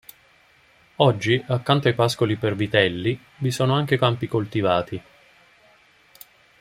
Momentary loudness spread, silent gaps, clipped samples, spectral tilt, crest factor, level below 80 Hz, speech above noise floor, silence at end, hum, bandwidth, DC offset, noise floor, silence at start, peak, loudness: 7 LU; none; under 0.1%; -6 dB/octave; 22 dB; -58 dBFS; 35 dB; 1.6 s; none; 16 kHz; under 0.1%; -57 dBFS; 1 s; -2 dBFS; -22 LUFS